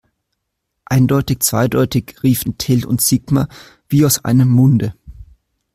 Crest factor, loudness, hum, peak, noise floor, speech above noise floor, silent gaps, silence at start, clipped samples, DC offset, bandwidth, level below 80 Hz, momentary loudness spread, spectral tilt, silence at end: 14 dB; -15 LUFS; none; 0 dBFS; -74 dBFS; 60 dB; none; 0.9 s; under 0.1%; under 0.1%; 16 kHz; -42 dBFS; 6 LU; -5.5 dB/octave; 0.5 s